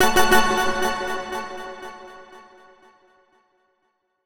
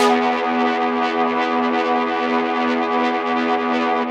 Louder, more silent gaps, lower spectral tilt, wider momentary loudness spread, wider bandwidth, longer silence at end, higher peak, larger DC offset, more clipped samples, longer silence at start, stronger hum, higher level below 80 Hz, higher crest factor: about the same, -21 LUFS vs -19 LUFS; neither; second, -2.5 dB/octave vs -4 dB/octave; first, 25 LU vs 1 LU; first, over 20 kHz vs 12 kHz; about the same, 0 s vs 0 s; about the same, -2 dBFS vs -4 dBFS; neither; neither; about the same, 0 s vs 0 s; neither; first, -42 dBFS vs -66 dBFS; first, 20 dB vs 14 dB